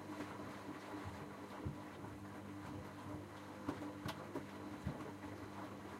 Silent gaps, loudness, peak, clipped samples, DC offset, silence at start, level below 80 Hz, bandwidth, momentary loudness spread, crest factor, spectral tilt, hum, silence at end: none; -49 LUFS; -28 dBFS; under 0.1%; under 0.1%; 0 s; -66 dBFS; 16 kHz; 4 LU; 22 dB; -6 dB/octave; none; 0 s